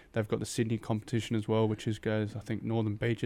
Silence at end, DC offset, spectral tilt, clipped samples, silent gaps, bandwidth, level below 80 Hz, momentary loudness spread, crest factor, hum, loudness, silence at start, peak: 0 s; under 0.1%; -6.5 dB/octave; under 0.1%; none; 15 kHz; -58 dBFS; 4 LU; 14 dB; none; -33 LUFS; 0.15 s; -16 dBFS